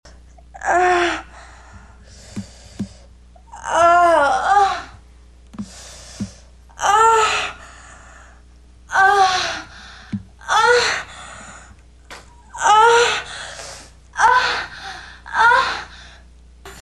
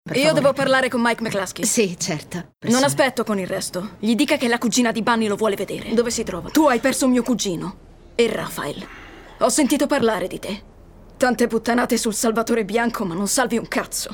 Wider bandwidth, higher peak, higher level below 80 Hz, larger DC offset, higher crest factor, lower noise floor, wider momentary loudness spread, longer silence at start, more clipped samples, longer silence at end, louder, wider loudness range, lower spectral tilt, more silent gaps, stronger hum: second, 12.5 kHz vs 17.5 kHz; about the same, -2 dBFS vs -4 dBFS; about the same, -46 dBFS vs -48 dBFS; first, 0.1% vs under 0.1%; about the same, 18 dB vs 16 dB; about the same, -46 dBFS vs -45 dBFS; first, 23 LU vs 11 LU; first, 0.55 s vs 0.05 s; neither; about the same, 0 s vs 0 s; first, -16 LUFS vs -20 LUFS; about the same, 4 LU vs 2 LU; second, -2 dB/octave vs -3.5 dB/octave; neither; first, 60 Hz at -45 dBFS vs none